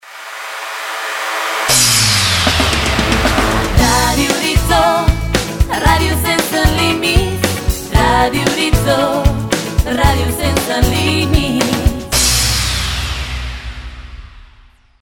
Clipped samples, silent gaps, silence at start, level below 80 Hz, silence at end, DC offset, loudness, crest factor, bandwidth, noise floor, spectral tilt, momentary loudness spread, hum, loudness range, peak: under 0.1%; none; 0.05 s; -22 dBFS; 0.6 s; under 0.1%; -13 LUFS; 14 dB; 19 kHz; -45 dBFS; -3.5 dB/octave; 11 LU; none; 3 LU; 0 dBFS